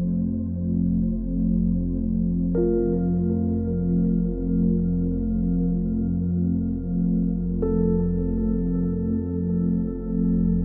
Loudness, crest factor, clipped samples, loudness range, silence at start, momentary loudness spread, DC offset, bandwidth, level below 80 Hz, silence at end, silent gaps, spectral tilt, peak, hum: -24 LUFS; 12 dB; under 0.1%; 1 LU; 0 s; 3 LU; under 0.1%; 1.9 kHz; -32 dBFS; 0 s; none; -16 dB/octave; -10 dBFS; none